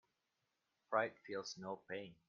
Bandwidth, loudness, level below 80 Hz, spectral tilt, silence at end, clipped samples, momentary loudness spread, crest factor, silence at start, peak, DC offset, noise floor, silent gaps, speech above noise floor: 7 kHz; -44 LUFS; -86 dBFS; -2.5 dB/octave; 0.15 s; under 0.1%; 9 LU; 24 dB; 0.9 s; -22 dBFS; under 0.1%; -87 dBFS; none; 43 dB